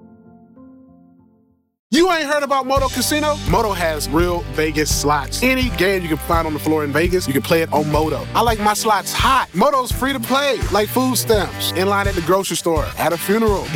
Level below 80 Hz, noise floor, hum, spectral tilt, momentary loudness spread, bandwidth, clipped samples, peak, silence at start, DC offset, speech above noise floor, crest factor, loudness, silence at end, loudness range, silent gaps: -32 dBFS; -58 dBFS; none; -4 dB/octave; 4 LU; 19 kHz; under 0.1%; -6 dBFS; 0.55 s; under 0.1%; 40 dB; 12 dB; -17 LUFS; 0 s; 2 LU; 1.79-1.90 s